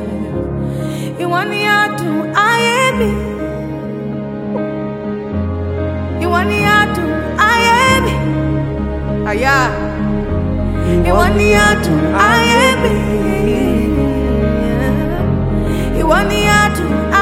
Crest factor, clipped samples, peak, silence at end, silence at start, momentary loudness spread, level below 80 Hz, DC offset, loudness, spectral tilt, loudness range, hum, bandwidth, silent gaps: 14 dB; under 0.1%; 0 dBFS; 0 s; 0 s; 11 LU; -24 dBFS; under 0.1%; -14 LUFS; -5.5 dB/octave; 5 LU; none; 16.5 kHz; none